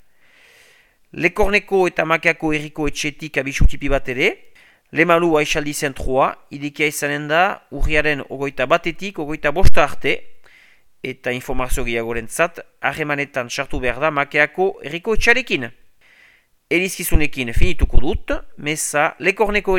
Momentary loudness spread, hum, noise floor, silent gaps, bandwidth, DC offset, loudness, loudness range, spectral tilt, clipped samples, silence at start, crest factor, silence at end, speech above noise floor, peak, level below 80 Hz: 9 LU; none; -54 dBFS; none; 16.5 kHz; under 0.1%; -19 LUFS; 4 LU; -4.5 dB/octave; 0.2%; 1.15 s; 18 dB; 0 s; 37 dB; 0 dBFS; -26 dBFS